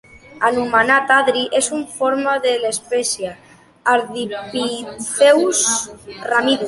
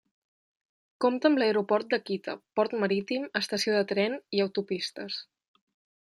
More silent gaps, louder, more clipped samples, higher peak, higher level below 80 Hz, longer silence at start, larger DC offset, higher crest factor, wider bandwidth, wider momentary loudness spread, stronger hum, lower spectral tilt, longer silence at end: neither; first, -17 LUFS vs -28 LUFS; neither; first, -2 dBFS vs -10 dBFS; first, -58 dBFS vs -78 dBFS; second, 0.15 s vs 1 s; neither; about the same, 16 dB vs 20 dB; second, 11.5 kHz vs 13 kHz; first, 12 LU vs 9 LU; neither; second, -1.5 dB/octave vs -4.5 dB/octave; second, 0 s vs 0.9 s